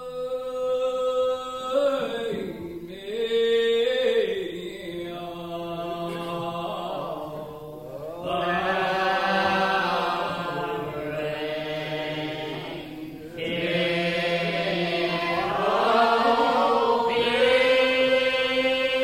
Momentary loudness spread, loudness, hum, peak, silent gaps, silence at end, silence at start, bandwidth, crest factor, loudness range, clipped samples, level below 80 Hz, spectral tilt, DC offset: 14 LU; -25 LUFS; none; -8 dBFS; none; 0 s; 0 s; 16 kHz; 18 dB; 10 LU; under 0.1%; -56 dBFS; -5 dB/octave; under 0.1%